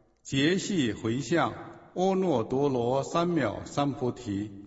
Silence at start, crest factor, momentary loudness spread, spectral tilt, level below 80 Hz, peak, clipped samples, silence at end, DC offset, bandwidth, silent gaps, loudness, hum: 0.25 s; 18 dB; 7 LU; -5.5 dB/octave; -60 dBFS; -12 dBFS; under 0.1%; 0 s; under 0.1%; 8 kHz; none; -28 LUFS; none